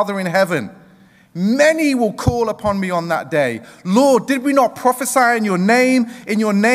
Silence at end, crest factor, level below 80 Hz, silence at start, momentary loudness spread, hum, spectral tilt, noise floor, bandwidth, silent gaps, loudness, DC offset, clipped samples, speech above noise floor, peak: 0 s; 14 dB; -44 dBFS; 0 s; 8 LU; none; -5 dB/octave; -48 dBFS; 16 kHz; none; -16 LUFS; under 0.1%; under 0.1%; 32 dB; -2 dBFS